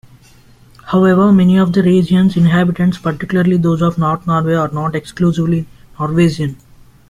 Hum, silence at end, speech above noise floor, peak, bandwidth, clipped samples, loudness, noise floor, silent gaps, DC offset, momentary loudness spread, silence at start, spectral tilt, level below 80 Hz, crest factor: none; 0.55 s; 32 dB; -2 dBFS; 11 kHz; under 0.1%; -14 LUFS; -44 dBFS; none; under 0.1%; 10 LU; 0.85 s; -8 dB/octave; -44 dBFS; 12 dB